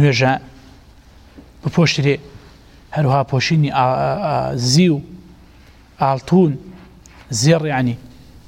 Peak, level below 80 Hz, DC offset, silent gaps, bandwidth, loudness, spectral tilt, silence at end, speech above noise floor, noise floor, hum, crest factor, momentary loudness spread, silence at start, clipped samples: -4 dBFS; -46 dBFS; under 0.1%; none; 15 kHz; -17 LUFS; -5.5 dB/octave; 0.4 s; 30 dB; -45 dBFS; none; 14 dB; 10 LU; 0 s; under 0.1%